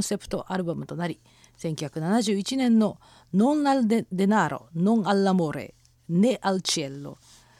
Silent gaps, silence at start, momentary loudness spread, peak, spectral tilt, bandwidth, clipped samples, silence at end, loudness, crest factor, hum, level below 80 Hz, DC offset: none; 0 s; 12 LU; -6 dBFS; -5.5 dB/octave; 14.5 kHz; under 0.1%; 0.45 s; -25 LUFS; 18 dB; none; -60 dBFS; under 0.1%